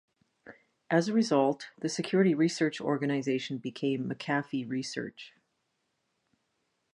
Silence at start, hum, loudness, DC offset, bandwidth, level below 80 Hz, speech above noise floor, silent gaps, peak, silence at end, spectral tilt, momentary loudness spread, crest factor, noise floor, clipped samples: 0.45 s; none; -30 LUFS; under 0.1%; 11 kHz; -80 dBFS; 50 dB; none; -12 dBFS; 1.65 s; -5.5 dB/octave; 11 LU; 20 dB; -79 dBFS; under 0.1%